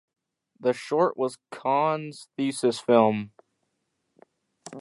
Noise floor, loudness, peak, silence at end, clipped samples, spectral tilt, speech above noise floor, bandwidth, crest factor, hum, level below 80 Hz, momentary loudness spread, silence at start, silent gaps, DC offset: -77 dBFS; -25 LUFS; -6 dBFS; 0 s; under 0.1%; -5.5 dB/octave; 52 dB; 11.5 kHz; 22 dB; none; -76 dBFS; 12 LU; 0.6 s; none; under 0.1%